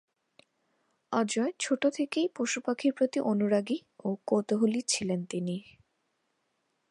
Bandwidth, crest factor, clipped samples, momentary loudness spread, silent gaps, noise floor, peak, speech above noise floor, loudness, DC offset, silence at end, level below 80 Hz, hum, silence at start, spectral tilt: 11 kHz; 18 dB; under 0.1%; 7 LU; none; -78 dBFS; -12 dBFS; 48 dB; -30 LUFS; under 0.1%; 1.3 s; -76 dBFS; none; 1.1 s; -4.5 dB/octave